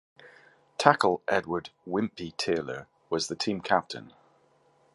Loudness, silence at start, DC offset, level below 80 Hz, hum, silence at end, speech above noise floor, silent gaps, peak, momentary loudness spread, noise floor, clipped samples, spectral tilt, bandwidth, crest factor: -28 LUFS; 0.25 s; under 0.1%; -64 dBFS; none; 0.85 s; 37 dB; none; -2 dBFS; 16 LU; -65 dBFS; under 0.1%; -4 dB/octave; 11.5 kHz; 28 dB